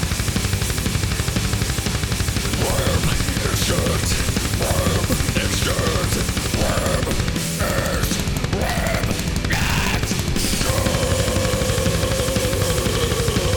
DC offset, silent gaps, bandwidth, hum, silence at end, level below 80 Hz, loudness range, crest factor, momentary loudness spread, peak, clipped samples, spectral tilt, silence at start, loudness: under 0.1%; none; over 20 kHz; none; 0 s; -28 dBFS; 1 LU; 12 dB; 2 LU; -8 dBFS; under 0.1%; -4 dB/octave; 0 s; -20 LUFS